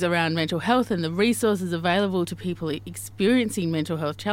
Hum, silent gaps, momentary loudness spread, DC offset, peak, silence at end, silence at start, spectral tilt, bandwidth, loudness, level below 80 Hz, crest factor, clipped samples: none; none; 8 LU; under 0.1%; -6 dBFS; 0 s; 0 s; -5 dB/octave; 16.5 kHz; -24 LUFS; -58 dBFS; 18 dB; under 0.1%